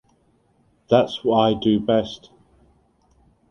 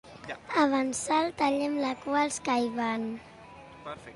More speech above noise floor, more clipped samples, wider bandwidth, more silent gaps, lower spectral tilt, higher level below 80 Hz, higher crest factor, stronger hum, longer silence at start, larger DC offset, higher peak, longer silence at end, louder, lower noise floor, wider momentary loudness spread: first, 43 dB vs 20 dB; neither; second, 6.8 kHz vs 11.5 kHz; neither; first, -7 dB/octave vs -3.5 dB/octave; first, -54 dBFS vs -64 dBFS; about the same, 20 dB vs 20 dB; neither; first, 0.9 s vs 0.05 s; neither; first, -4 dBFS vs -10 dBFS; first, 1.35 s vs 0 s; first, -20 LUFS vs -28 LUFS; first, -62 dBFS vs -49 dBFS; second, 9 LU vs 18 LU